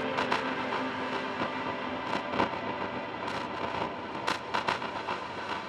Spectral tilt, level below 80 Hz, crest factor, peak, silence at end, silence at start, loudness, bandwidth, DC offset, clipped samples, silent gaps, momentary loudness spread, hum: -4.5 dB/octave; -64 dBFS; 22 dB; -12 dBFS; 0 s; 0 s; -33 LUFS; 13.5 kHz; under 0.1%; under 0.1%; none; 5 LU; none